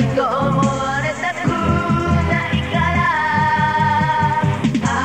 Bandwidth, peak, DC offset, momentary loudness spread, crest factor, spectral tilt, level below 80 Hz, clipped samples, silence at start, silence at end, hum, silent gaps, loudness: 10.5 kHz; -4 dBFS; 0.4%; 4 LU; 14 dB; -6 dB/octave; -34 dBFS; under 0.1%; 0 s; 0 s; none; none; -17 LUFS